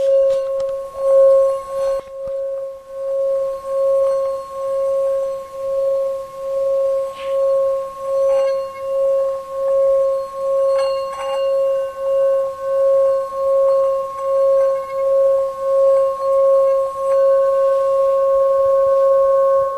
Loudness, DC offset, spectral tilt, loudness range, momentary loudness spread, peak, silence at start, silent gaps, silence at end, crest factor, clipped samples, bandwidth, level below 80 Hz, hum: -17 LUFS; under 0.1%; -3.5 dB/octave; 5 LU; 9 LU; -6 dBFS; 0 s; none; 0 s; 12 dB; under 0.1%; 10.5 kHz; -54 dBFS; none